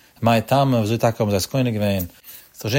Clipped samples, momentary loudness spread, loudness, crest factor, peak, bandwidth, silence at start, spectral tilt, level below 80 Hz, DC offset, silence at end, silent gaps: under 0.1%; 14 LU; -20 LUFS; 16 dB; -4 dBFS; 16.5 kHz; 0.2 s; -6 dB/octave; -52 dBFS; under 0.1%; 0 s; none